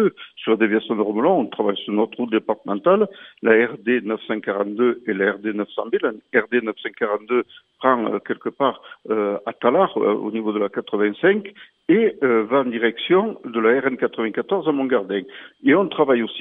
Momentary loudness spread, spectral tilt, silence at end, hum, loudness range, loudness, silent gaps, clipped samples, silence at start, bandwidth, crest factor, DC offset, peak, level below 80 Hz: 8 LU; -9 dB/octave; 0 s; none; 3 LU; -21 LUFS; none; under 0.1%; 0 s; 3.9 kHz; 20 dB; under 0.1%; 0 dBFS; -78 dBFS